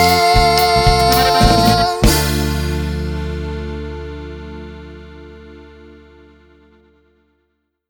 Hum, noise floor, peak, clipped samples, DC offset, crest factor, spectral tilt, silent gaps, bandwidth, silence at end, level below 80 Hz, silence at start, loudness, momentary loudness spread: none; -68 dBFS; 0 dBFS; under 0.1%; under 0.1%; 16 dB; -4.5 dB/octave; none; over 20 kHz; 2 s; -24 dBFS; 0 s; -14 LUFS; 21 LU